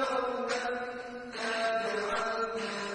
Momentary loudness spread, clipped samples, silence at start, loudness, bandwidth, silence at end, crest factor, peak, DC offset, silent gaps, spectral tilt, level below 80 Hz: 7 LU; under 0.1%; 0 s; -33 LUFS; 10.5 kHz; 0 s; 16 dB; -18 dBFS; under 0.1%; none; -2.5 dB/octave; -66 dBFS